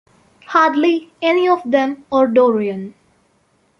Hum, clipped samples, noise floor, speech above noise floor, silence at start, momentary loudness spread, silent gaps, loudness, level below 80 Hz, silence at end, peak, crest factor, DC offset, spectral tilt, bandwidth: none; under 0.1%; -60 dBFS; 44 dB; 0.5 s; 9 LU; none; -16 LUFS; -62 dBFS; 0.9 s; -2 dBFS; 16 dB; under 0.1%; -6 dB/octave; 6.8 kHz